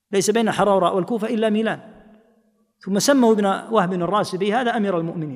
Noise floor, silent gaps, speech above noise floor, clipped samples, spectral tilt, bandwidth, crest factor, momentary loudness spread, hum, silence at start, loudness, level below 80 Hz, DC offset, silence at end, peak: -62 dBFS; none; 43 dB; under 0.1%; -5 dB/octave; 15.5 kHz; 16 dB; 8 LU; none; 0.1 s; -20 LUFS; -62 dBFS; under 0.1%; 0 s; -4 dBFS